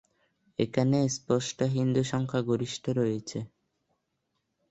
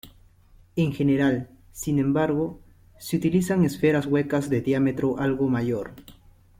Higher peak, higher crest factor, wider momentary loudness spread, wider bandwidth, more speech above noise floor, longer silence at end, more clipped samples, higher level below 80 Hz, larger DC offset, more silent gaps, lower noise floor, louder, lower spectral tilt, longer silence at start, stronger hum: about the same, -12 dBFS vs -10 dBFS; about the same, 18 dB vs 16 dB; about the same, 12 LU vs 11 LU; second, 8.2 kHz vs 16.5 kHz; first, 52 dB vs 31 dB; first, 1.25 s vs 0.45 s; neither; second, -64 dBFS vs -52 dBFS; neither; neither; first, -79 dBFS vs -54 dBFS; second, -29 LUFS vs -24 LUFS; about the same, -6 dB/octave vs -7 dB/octave; first, 0.6 s vs 0.05 s; neither